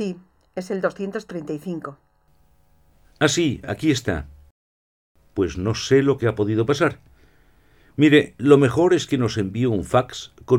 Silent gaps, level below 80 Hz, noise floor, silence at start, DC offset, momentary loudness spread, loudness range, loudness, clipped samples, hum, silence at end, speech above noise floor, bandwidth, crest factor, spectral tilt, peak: 4.51-5.15 s; -48 dBFS; -60 dBFS; 0 s; under 0.1%; 16 LU; 7 LU; -21 LUFS; under 0.1%; none; 0 s; 40 dB; 14.5 kHz; 22 dB; -6 dB/octave; 0 dBFS